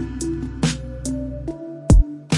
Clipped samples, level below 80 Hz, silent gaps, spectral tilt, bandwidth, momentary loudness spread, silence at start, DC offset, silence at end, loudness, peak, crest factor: under 0.1%; -22 dBFS; none; -6 dB/octave; 11.5 kHz; 13 LU; 0 s; under 0.1%; 0 s; -23 LUFS; -4 dBFS; 18 dB